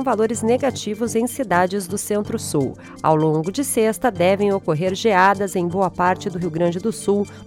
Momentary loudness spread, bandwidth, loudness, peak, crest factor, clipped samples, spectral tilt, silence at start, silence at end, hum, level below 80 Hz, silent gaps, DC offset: 6 LU; 17.5 kHz; -20 LUFS; -4 dBFS; 16 dB; under 0.1%; -5 dB/octave; 0 s; 0 s; none; -52 dBFS; none; under 0.1%